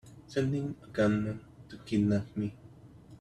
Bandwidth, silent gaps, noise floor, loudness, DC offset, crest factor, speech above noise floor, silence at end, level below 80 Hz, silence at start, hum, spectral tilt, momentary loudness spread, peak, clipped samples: 10 kHz; none; -53 dBFS; -32 LUFS; under 0.1%; 16 dB; 22 dB; 0.05 s; -60 dBFS; 0.05 s; none; -7.5 dB/octave; 13 LU; -16 dBFS; under 0.1%